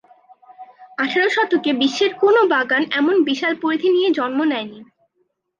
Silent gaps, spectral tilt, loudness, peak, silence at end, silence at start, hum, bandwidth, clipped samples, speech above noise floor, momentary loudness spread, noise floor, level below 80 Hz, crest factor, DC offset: none; -3.5 dB/octave; -18 LUFS; -6 dBFS; 0.75 s; 0.5 s; none; 7.4 kHz; under 0.1%; 51 dB; 7 LU; -69 dBFS; -74 dBFS; 14 dB; under 0.1%